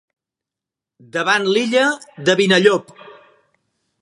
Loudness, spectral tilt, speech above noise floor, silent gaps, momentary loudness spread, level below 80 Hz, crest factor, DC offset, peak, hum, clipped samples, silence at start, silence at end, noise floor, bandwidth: -16 LUFS; -4 dB/octave; 70 dB; none; 9 LU; -70 dBFS; 20 dB; under 0.1%; 0 dBFS; none; under 0.1%; 1.15 s; 0.9 s; -86 dBFS; 11.5 kHz